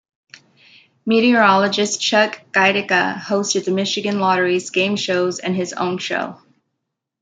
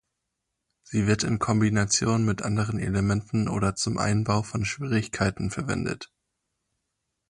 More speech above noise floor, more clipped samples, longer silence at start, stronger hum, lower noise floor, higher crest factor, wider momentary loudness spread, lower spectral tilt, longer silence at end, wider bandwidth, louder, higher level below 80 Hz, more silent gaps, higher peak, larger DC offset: first, 60 dB vs 56 dB; neither; first, 1.05 s vs 0.9 s; neither; second, -78 dBFS vs -82 dBFS; about the same, 18 dB vs 16 dB; about the same, 9 LU vs 7 LU; second, -3.5 dB/octave vs -5 dB/octave; second, 0.85 s vs 1.25 s; second, 9.4 kHz vs 11.5 kHz; first, -17 LUFS vs -26 LUFS; second, -68 dBFS vs -48 dBFS; neither; first, -2 dBFS vs -10 dBFS; neither